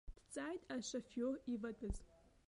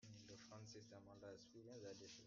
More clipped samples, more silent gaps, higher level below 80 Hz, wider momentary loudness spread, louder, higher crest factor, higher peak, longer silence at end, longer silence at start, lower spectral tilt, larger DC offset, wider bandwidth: neither; neither; first, -58 dBFS vs -86 dBFS; first, 7 LU vs 4 LU; first, -46 LUFS vs -60 LUFS; about the same, 16 dB vs 16 dB; first, -30 dBFS vs -46 dBFS; first, 0.3 s vs 0 s; about the same, 0.05 s vs 0 s; about the same, -4.5 dB/octave vs -4.5 dB/octave; neither; first, 11.5 kHz vs 7.4 kHz